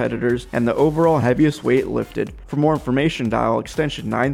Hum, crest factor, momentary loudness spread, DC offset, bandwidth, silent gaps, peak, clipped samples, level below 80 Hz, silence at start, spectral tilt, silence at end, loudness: none; 14 dB; 7 LU; under 0.1%; 15.5 kHz; none; -6 dBFS; under 0.1%; -42 dBFS; 0 s; -7 dB/octave; 0 s; -19 LUFS